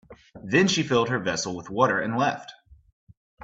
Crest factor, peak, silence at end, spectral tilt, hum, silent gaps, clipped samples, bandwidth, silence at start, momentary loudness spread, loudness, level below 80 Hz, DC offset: 20 dB; -6 dBFS; 0 s; -4.5 dB/octave; none; 2.93-3.07 s, 3.17-3.37 s; under 0.1%; 8.2 kHz; 0.1 s; 14 LU; -24 LUFS; -60 dBFS; under 0.1%